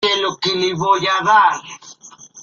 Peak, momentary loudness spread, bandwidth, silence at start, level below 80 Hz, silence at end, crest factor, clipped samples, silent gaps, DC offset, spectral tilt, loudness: -2 dBFS; 17 LU; 7.4 kHz; 0 s; -60 dBFS; 0 s; 16 dB; under 0.1%; none; under 0.1%; -3 dB/octave; -15 LUFS